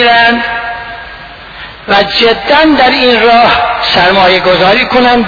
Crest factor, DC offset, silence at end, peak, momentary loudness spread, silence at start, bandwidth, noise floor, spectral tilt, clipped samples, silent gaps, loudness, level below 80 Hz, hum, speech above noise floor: 8 dB; under 0.1%; 0 s; 0 dBFS; 19 LU; 0 s; 5.4 kHz; -28 dBFS; -5 dB/octave; 0.8%; none; -7 LUFS; -34 dBFS; none; 21 dB